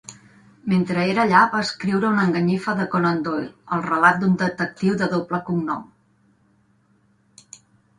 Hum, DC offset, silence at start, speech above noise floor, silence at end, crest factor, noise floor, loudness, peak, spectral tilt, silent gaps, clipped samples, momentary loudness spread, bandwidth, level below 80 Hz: none; under 0.1%; 0.1 s; 41 dB; 2.15 s; 20 dB; -61 dBFS; -21 LUFS; -2 dBFS; -6.5 dB/octave; none; under 0.1%; 11 LU; 10 kHz; -60 dBFS